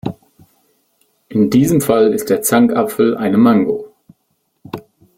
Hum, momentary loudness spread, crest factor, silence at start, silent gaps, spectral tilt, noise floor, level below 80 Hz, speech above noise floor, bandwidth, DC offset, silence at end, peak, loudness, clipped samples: none; 19 LU; 14 dB; 0.05 s; none; -6 dB/octave; -66 dBFS; -52 dBFS; 53 dB; 16.5 kHz; under 0.1%; 0.35 s; -2 dBFS; -14 LUFS; under 0.1%